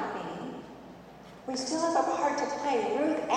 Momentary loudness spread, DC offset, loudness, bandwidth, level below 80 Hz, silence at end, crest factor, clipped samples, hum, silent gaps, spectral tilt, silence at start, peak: 21 LU; under 0.1%; -30 LUFS; 11 kHz; -66 dBFS; 0 s; 18 dB; under 0.1%; none; none; -3.5 dB/octave; 0 s; -14 dBFS